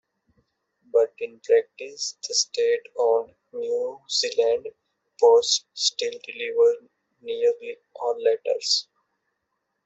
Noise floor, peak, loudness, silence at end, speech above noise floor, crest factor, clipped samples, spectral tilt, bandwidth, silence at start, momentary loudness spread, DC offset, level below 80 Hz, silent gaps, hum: -78 dBFS; -6 dBFS; -23 LUFS; 1.05 s; 55 dB; 18 dB; under 0.1%; 1 dB/octave; 8.2 kHz; 0.95 s; 13 LU; under 0.1%; -76 dBFS; none; none